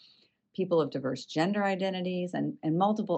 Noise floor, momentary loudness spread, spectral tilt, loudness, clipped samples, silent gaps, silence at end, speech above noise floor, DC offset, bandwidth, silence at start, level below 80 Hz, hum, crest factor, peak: -64 dBFS; 6 LU; -7 dB/octave; -30 LUFS; under 0.1%; none; 0 s; 35 dB; under 0.1%; 8.6 kHz; 0.6 s; -80 dBFS; none; 16 dB; -14 dBFS